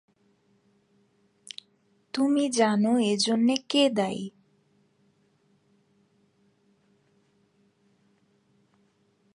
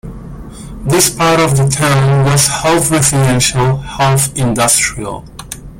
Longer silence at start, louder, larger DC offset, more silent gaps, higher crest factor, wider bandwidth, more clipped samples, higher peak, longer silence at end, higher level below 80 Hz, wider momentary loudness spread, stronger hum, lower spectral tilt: first, 2.15 s vs 0.05 s; second, -25 LUFS vs -11 LUFS; neither; neither; first, 22 dB vs 12 dB; second, 11 kHz vs 17 kHz; neither; second, -8 dBFS vs 0 dBFS; first, 5.05 s vs 0 s; second, -78 dBFS vs -34 dBFS; about the same, 20 LU vs 18 LU; neither; about the same, -4 dB/octave vs -4 dB/octave